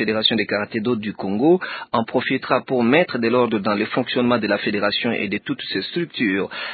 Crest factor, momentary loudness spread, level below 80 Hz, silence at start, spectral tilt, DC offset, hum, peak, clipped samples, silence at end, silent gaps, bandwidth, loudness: 18 dB; 7 LU; -58 dBFS; 0 s; -10.5 dB/octave; under 0.1%; none; -2 dBFS; under 0.1%; 0 s; none; 4.8 kHz; -20 LUFS